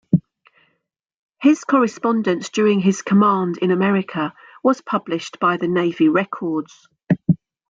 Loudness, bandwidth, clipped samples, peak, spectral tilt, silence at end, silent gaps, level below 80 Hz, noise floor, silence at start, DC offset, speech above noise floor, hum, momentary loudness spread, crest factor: -19 LUFS; 7.6 kHz; under 0.1%; -4 dBFS; -6.5 dB/octave; 0.35 s; 1.14-1.29 s; -62 dBFS; -72 dBFS; 0.1 s; under 0.1%; 54 dB; none; 9 LU; 16 dB